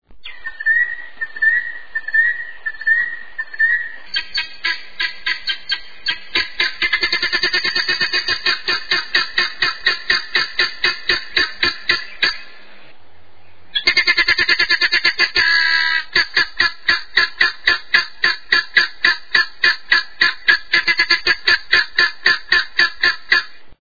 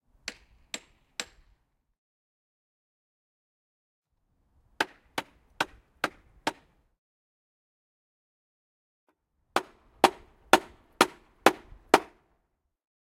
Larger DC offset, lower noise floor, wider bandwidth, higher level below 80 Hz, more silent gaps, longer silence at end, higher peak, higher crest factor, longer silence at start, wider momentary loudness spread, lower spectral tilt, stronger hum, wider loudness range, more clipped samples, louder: first, 2% vs under 0.1%; second, -51 dBFS vs -77 dBFS; second, 5.4 kHz vs 16 kHz; first, -50 dBFS vs -64 dBFS; second, none vs 1.98-4.02 s, 6.98-9.07 s; second, 0 s vs 1 s; about the same, 0 dBFS vs 0 dBFS; second, 18 dB vs 34 dB; second, 0 s vs 0.75 s; second, 9 LU vs 17 LU; second, -0.5 dB/octave vs -2.5 dB/octave; neither; second, 5 LU vs 18 LU; neither; first, -16 LUFS vs -29 LUFS